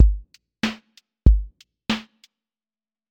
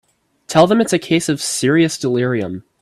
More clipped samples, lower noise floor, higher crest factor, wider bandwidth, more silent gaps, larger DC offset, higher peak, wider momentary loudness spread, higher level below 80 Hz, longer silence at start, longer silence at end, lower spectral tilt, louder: neither; first, under -90 dBFS vs -35 dBFS; first, 22 dB vs 16 dB; second, 7.8 kHz vs 14.5 kHz; neither; neither; about the same, 0 dBFS vs 0 dBFS; first, 18 LU vs 7 LU; first, -24 dBFS vs -56 dBFS; second, 0 s vs 0.5 s; first, 1.1 s vs 0.2 s; first, -6 dB/octave vs -4.5 dB/octave; second, -24 LUFS vs -16 LUFS